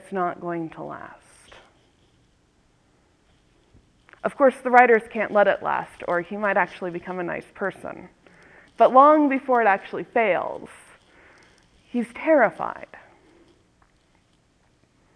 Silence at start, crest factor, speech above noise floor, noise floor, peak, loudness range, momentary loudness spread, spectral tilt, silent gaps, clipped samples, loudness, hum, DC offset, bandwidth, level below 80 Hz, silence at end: 0.1 s; 24 dB; 41 dB; -63 dBFS; 0 dBFS; 8 LU; 20 LU; -6.5 dB/octave; none; under 0.1%; -21 LUFS; none; under 0.1%; 11 kHz; -64 dBFS; 2.2 s